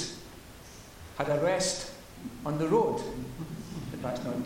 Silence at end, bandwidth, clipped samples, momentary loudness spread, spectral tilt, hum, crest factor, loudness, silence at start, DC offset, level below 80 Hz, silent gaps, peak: 0 s; 16.5 kHz; under 0.1%; 21 LU; -4.5 dB/octave; none; 20 dB; -31 LUFS; 0 s; under 0.1%; -54 dBFS; none; -12 dBFS